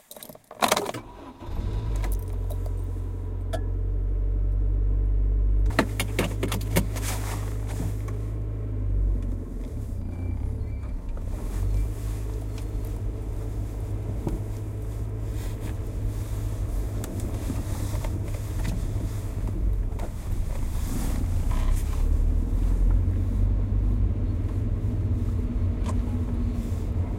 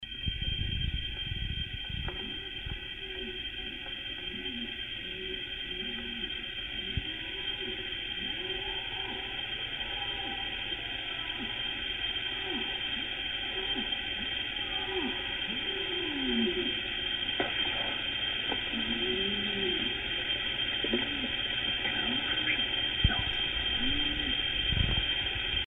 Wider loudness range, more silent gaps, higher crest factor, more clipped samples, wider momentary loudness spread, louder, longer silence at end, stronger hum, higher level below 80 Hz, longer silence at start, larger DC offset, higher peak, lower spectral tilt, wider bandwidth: about the same, 5 LU vs 7 LU; neither; about the same, 22 dB vs 22 dB; neither; about the same, 7 LU vs 8 LU; about the same, -29 LUFS vs -31 LUFS; about the same, 0 s vs 0 s; neither; first, -28 dBFS vs -44 dBFS; about the same, 0.1 s vs 0 s; neither; first, -4 dBFS vs -10 dBFS; about the same, -6 dB/octave vs -5.5 dB/octave; about the same, 16.5 kHz vs 15 kHz